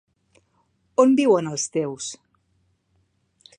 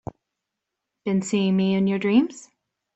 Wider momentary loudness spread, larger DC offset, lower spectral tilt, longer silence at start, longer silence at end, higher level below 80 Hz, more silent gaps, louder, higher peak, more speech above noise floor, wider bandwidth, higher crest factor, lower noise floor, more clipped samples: first, 16 LU vs 11 LU; neither; second, -4.5 dB/octave vs -6.5 dB/octave; about the same, 1 s vs 1.05 s; first, 1.45 s vs 0.55 s; second, -72 dBFS vs -62 dBFS; neither; about the same, -21 LUFS vs -22 LUFS; first, -2 dBFS vs -8 dBFS; second, 48 dB vs 62 dB; first, 10.5 kHz vs 8.2 kHz; first, 22 dB vs 16 dB; second, -67 dBFS vs -83 dBFS; neither